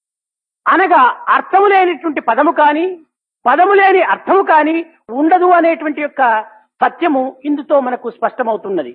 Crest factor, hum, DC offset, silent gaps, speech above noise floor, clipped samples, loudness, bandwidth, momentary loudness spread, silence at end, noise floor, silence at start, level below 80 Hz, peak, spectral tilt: 14 dB; none; under 0.1%; none; 74 dB; under 0.1%; -13 LUFS; 4.9 kHz; 10 LU; 0 s; -86 dBFS; 0.65 s; -76 dBFS; 0 dBFS; -8 dB/octave